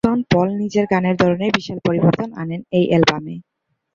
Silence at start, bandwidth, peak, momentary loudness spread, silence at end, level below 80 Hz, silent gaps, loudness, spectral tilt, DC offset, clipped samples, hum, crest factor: 0.05 s; 7.6 kHz; 0 dBFS; 11 LU; 0.55 s; -48 dBFS; none; -18 LUFS; -6.5 dB/octave; under 0.1%; under 0.1%; none; 18 dB